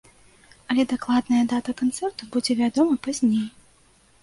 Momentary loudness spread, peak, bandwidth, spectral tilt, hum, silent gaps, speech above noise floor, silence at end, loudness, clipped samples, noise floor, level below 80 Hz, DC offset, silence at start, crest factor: 6 LU; -8 dBFS; 11.5 kHz; -4.5 dB/octave; none; none; 35 dB; 0.75 s; -23 LUFS; under 0.1%; -58 dBFS; -60 dBFS; under 0.1%; 0.7 s; 16 dB